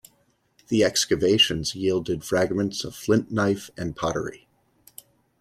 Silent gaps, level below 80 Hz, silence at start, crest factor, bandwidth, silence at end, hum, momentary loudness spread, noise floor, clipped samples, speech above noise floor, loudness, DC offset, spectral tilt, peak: none; -54 dBFS; 0.7 s; 18 dB; 15.5 kHz; 1.05 s; none; 10 LU; -66 dBFS; under 0.1%; 42 dB; -23 LUFS; under 0.1%; -4 dB/octave; -6 dBFS